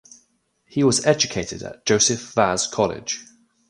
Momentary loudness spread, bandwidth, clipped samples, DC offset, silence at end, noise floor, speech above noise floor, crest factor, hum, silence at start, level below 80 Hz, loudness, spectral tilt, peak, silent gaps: 12 LU; 11.5 kHz; under 0.1%; under 0.1%; 0.45 s; -66 dBFS; 45 dB; 20 dB; none; 0.75 s; -52 dBFS; -21 LUFS; -3 dB/octave; -2 dBFS; none